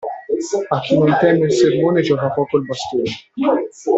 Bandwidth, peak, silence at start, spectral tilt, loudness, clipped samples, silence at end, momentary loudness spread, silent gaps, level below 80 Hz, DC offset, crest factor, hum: 8.2 kHz; -4 dBFS; 0 s; -6 dB/octave; -17 LUFS; under 0.1%; 0 s; 8 LU; none; -56 dBFS; under 0.1%; 14 dB; none